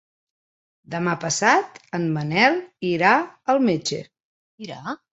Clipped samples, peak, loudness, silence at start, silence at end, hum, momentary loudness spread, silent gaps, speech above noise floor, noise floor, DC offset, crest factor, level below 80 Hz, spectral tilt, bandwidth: under 0.1%; -2 dBFS; -21 LUFS; 0.9 s; 0.15 s; none; 15 LU; 4.24-4.58 s; over 68 dB; under -90 dBFS; under 0.1%; 22 dB; -66 dBFS; -4 dB/octave; 8.4 kHz